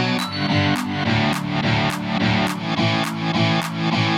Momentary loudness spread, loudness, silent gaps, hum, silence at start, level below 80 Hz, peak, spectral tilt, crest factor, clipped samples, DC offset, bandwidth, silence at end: 3 LU; -20 LUFS; none; none; 0 s; -48 dBFS; -6 dBFS; -5.5 dB/octave; 14 dB; under 0.1%; under 0.1%; 16.5 kHz; 0 s